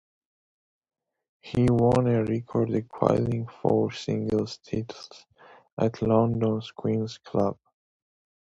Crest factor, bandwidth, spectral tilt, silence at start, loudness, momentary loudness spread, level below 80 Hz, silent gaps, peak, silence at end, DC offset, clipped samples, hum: 24 dB; 10.5 kHz; -8 dB/octave; 1.45 s; -26 LUFS; 11 LU; -54 dBFS; 5.72-5.77 s; -4 dBFS; 0.9 s; under 0.1%; under 0.1%; none